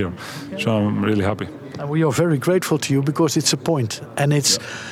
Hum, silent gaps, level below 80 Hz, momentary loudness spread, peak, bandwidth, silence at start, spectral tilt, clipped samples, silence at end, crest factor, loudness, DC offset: none; none; -62 dBFS; 11 LU; -4 dBFS; 16.5 kHz; 0 s; -4.5 dB/octave; under 0.1%; 0 s; 16 dB; -20 LUFS; under 0.1%